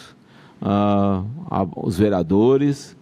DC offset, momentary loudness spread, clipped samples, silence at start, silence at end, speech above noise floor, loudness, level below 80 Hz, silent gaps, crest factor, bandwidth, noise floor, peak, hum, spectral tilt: under 0.1%; 9 LU; under 0.1%; 0 s; 0.1 s; 29 dB; -20 LUFS; -50 dBFS; none; 16 dB; 13 kHz; -48 dBFS; -4 dBFS; none; -8 dB/octave